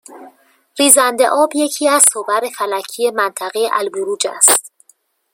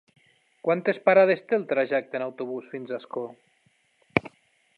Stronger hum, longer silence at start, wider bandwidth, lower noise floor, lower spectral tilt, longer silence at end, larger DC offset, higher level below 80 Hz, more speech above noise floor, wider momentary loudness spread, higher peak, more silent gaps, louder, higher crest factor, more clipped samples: neither; second, 0.1 s vs 0.65 s; first, over 20 kHz vs 5.2 kHz; second, -55 dBFS vs -67 dBFS; second, 0 dB/octave vs -8 dB/octave; first, 0.65 s vs 0.5 s; neither; second, -70 dBFS vs -64 dBFS; about the same, 41 dB vs 42 dB; second, 11 LU vs 16 LU; about the same, 0 dBFS vs -2 dBFS; neither; first, -13 LUFS vs -25 LUFS; second, 16 dB vs 26 dB; first, 0.2% vs under 0.1%